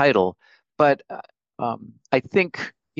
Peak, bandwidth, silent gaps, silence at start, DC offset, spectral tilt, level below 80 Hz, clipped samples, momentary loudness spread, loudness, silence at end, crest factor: -2 dBFS; 7.4 kHz; none; 0 s; under 0.1%; -6.5 dB/octave; -68 dBFS; under 0.1%; 15 LU; -23 LUFS; 0.3 s; 22 dB